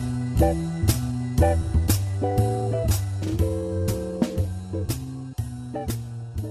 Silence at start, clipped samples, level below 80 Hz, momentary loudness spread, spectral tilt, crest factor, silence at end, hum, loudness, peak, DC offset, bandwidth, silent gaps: 0 s; under 0.1%; -32 dBFS; 10 LU; -6.5 dB/octave; 16 dB; 0 s; none; -25 LUFS; -8 dBFS; under 0.1%; 14 kHz; none